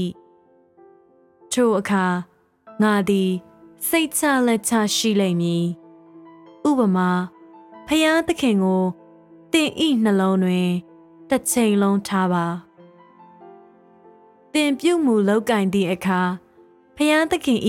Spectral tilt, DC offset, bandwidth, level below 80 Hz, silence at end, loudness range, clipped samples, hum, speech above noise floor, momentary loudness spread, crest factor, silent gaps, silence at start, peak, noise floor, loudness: -5 dB/octave; under 0.1%; 16.5 kHz; -60 dBFS; 0 s; 3 LU; under 0.1%; none; 36 dB; 8 LU; 16 dB; none; 0 s; -6 dBFS; -55 dBFS; -20 LUFS